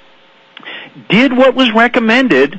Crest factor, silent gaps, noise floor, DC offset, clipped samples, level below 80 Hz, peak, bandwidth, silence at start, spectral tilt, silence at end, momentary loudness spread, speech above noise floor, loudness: 12 dB; none; -45 dBFS; under 0.1%; under 0.1%; -50 dBFS; 0 dBFS; 8.2 kHz; 0.65 s; -5.5 dB/octave; 0 s; 19 LU; 36 dB; -10 LUFS